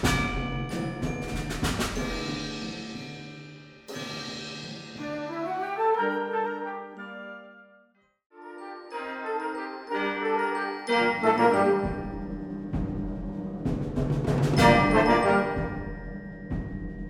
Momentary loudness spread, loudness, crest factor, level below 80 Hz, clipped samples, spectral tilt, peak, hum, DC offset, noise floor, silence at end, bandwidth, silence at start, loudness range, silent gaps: 18 LU; -28 LUFS; 22 dB; -42 dBFS; under 0.1%; -5.5 dB/octave; -6 dBFS; none; under 0.1%; -64 dBFS; 0 s; 16 kHz; 0 s; 11 LU; 8.26-8.30 s